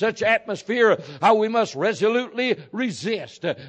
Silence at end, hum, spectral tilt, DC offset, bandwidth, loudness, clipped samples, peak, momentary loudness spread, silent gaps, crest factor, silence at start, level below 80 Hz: 0 s; none; -4.5 dB/octave; under 0.1%; 9 kHz; -22 LUFS; under 0.1%; -6 dBFS; 8 LU; none; 16 dB; 0 s; -68 dBFS